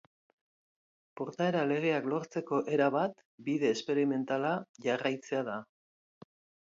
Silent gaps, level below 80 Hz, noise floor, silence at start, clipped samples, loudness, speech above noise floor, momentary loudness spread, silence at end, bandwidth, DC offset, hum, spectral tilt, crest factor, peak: 3.25-3.38 s, 4.69-4.74 s; -82 dBFS; under -90 dBFS; 1.15 s; under 0.1%; -32 LUFS; over 58 dB; 8 LU; 1 s; 7.8 kHz; under 0.1%; none; -6 dB/octave; 20 dB; -14 dBFS